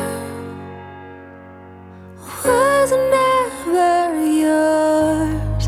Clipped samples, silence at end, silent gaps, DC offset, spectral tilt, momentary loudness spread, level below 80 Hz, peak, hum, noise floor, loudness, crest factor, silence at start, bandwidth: under 0.1%; 0 s; none; under 0.1%; -5.5 dB/octave; 21 LU; -36 dBFS; -4 dBFS; none; -39 dBFS; -17 LUFS; 14 dB; 0 s; 15.5 kHz